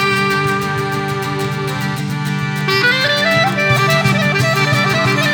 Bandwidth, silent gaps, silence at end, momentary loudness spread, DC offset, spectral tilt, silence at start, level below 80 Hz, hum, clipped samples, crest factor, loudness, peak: over 20 kHz; none; 0 s; 7 LU; under 0.1%; -4.5 dB/octave; 0 s; -48 dBFS; none; under 0.1%; 14 dB; -15 LUFS; -2 dBFS